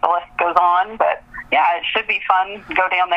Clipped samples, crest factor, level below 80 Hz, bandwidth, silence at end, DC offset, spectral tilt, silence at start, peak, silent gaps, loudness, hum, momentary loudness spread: under 0.1%; 18 dB; -52 dBFS; 6.2 kHz; 0 s; under 0.1%; -4 dB/octave; 0.05 s; 0 dBFS; none; -18 LUFS; none; 4 LU